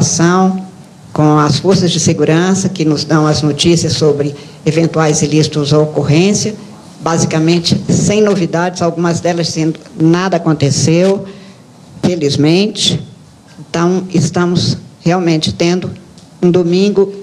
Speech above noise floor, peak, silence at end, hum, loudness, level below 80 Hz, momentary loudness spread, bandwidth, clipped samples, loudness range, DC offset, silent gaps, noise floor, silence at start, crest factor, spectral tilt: 26 dB; 0 dBFS; 0 s; none; -12 LUFS; -46 dBFS; 7 LU; 12 kHz; under 0.1%; 3 LU; under 0.1%; none; -38 dBFS; 0 s; 12 dB; -5 dB/octave